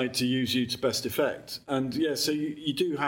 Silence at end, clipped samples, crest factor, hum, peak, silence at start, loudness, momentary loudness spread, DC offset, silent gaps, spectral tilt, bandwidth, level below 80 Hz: 0 s; under 0.1%; 16 dB; none; -12 dBFS; 0 s; -28 LUFS; 4 LU; under 0.1%; none; -4 dB/octave; 17 kHz; -64 dBFS